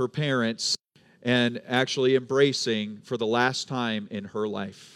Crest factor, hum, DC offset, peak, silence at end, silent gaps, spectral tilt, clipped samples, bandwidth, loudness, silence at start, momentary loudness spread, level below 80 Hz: 20 dB; none; under 0.1%; -8 dBFS; 0.1 s; none; -4.5 dB/octave; under 0.1%; 13 kHz; -26 LUFS; 0 s; 9 LU; -78 dBFS